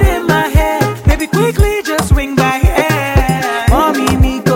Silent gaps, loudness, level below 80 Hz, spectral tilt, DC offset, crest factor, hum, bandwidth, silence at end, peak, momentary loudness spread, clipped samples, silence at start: none; -13 LUFS; -16 dBFS; -5.5 dB/octave; under 0.1%; 12 dB; none; 17 kHz; 0 s; 0 dBFS; 2 LU; under 0.1%; 0 s